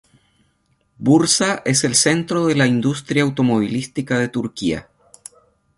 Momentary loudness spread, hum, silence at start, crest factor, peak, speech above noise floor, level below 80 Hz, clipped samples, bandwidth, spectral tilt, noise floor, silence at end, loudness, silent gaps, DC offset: 9 LU; none; 1 s; 18 dB; -2 dBFS; 46 dB; -54 dBFS; under 0.1%; 11.5 kHz; -4 dB/octave; -64 dBFS; 0.95 s; -18 LUFS; none; under 0.1%